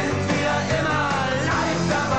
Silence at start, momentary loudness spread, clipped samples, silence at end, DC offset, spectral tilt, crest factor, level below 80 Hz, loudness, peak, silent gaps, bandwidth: 0 s; 1 LU; under 0.1%; 0 s; 0.7%; -5 dB/octave; 12 dB; -44 dBFS; -22 LUFS; -10 dBFS; none; 9 kHz